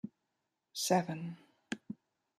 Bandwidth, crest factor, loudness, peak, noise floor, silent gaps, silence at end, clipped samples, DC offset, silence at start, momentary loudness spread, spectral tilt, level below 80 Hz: 15 kHz; 24 dB; -37 LUFS; -16 dBFS; -85 dBFS; none; 0.45 s; under 0.1%; under 0.1%; 0.05 s; 19 LU; -4 dB/octave; -82 dBFS